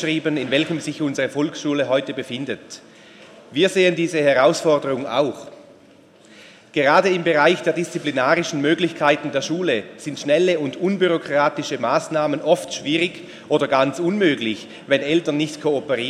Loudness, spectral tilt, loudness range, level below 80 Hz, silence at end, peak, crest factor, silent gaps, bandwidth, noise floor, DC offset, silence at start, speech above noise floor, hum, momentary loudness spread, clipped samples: -20 LUFS; -4.5 dB/octave; 3 LU; -68 dBFS; 0 s; -2 dBFS; 18 dB; none; 13 kHz; -49 dBFS; under 0.1%; 0 s; 30 dB; none; 11 LU; under 0.1%